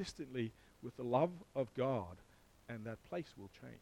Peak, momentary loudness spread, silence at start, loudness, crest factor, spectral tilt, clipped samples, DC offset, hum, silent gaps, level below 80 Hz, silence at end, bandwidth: -20 dBFS; 17 LU; 0 s; -41 LUFS; 22 dB; -7 dB/octave; under 0.1%; under 0.1%; none; none; -68 dBFS; 0 s; 16.5 kHz